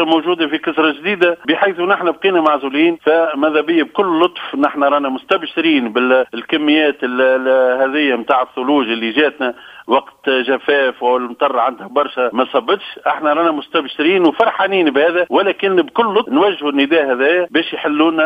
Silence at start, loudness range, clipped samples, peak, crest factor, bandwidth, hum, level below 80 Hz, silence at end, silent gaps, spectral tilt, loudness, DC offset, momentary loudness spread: 0 s; 2 LU; under 0.1%; 0 dBFS; 14 dB; 5 kHz; none; -64 dBFS; 0 s; none; -6 dB/octave; -15 LUFS; under 0.1%; 4 LU